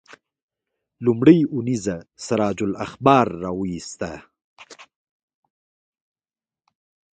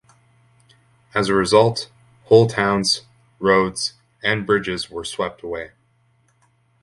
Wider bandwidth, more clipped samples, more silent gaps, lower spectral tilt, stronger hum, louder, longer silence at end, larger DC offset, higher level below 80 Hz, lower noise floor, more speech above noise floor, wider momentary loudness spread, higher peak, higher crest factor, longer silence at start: second, 9.2 kHz vs 11.5 kHz; neither; first, 4.44-4.56 s vs none; first, -6.5 dB/octave vs -4.5 dB/octave; neither; about the same, -20 LUFS vs -19 LUFS; first, 2.35 s vs 1.15 s; neither; about the same, -54 dBFS vs -52 dBFS; first, under -90 dBFS vs -61 dBFS; first, over 70 dB vs 43 dB; about the same, 17 LU vs 15 LU; about the same, 0 dBFS vs 0 dBFS; about the same, 24 dB vs 20 dB; second, 1 s vs 1.15 s